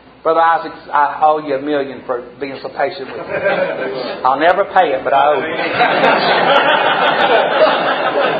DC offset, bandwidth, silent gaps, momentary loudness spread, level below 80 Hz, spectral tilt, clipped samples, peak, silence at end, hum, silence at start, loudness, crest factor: under 0.1%; 6.8 kHz; none; 11 LU; -56 dBFS; -6 dB/octave; under 0.1%; 0 dBFS; 0 s; none; 0.25 s; -14 LUFS; 14 dB